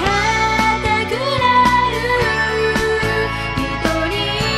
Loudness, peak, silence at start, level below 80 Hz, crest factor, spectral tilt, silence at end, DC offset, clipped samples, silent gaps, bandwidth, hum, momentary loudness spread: -16 LUFS; -4 dBFS; 0 s; -32 dBFS; 14 dB; -4.5 dB/octave; 0 s; under 0.1%; under 0.1%; none; 15 kHz; none; 6 LU